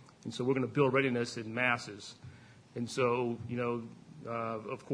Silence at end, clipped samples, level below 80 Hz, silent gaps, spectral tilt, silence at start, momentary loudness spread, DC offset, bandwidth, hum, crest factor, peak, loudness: 0 s; under 0.1%; -72 dBFS; none; -6 dB/octave; 0 s; 19 LU; under 0.1%; 10.5 kHz; none; 20 dB; -14 dBFS; -33 LUFS